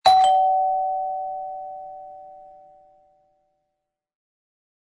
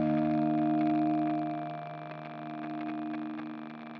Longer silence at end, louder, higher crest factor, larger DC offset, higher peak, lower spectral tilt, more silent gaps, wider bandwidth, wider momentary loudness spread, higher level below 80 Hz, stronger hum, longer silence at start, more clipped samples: first, 2.5 s vs 0 s; first, -21 LUFS vs -32 LUFS; first, 20 dB vs 14 dB; neither; first, -4 dBFS vs -18 dBFS; second, -1 dB/octave vs -7 dB/octave; neither; first, 11 kHz vs 5 kHz; first, 25 LU vs 13 LU; first, -64 dBFS vs -70 dBFS; neither; about the same, 0.05 s vs 0 s; neither